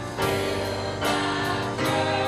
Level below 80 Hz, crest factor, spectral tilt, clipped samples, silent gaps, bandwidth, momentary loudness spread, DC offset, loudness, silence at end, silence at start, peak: -48 dBFS; 14 dB; -4.5 dB/octave; under 0.1%; none; 15.5 kHz; 3 LU; under 0.1%; -25 LUFS; 0 s; 0 s; -12 dBFS